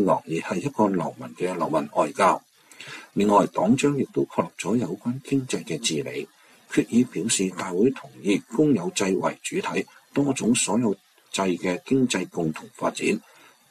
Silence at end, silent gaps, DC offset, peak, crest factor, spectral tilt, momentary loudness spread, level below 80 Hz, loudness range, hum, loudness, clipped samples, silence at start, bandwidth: 0.5 s; none; under 0.1%; -6 dBFS; 18 dB; -4.5 dB/octave; 10 LU; -64 dBFS; 2 LU; none; -24 LUFS; under 0.1%; 0 s; 14 kHz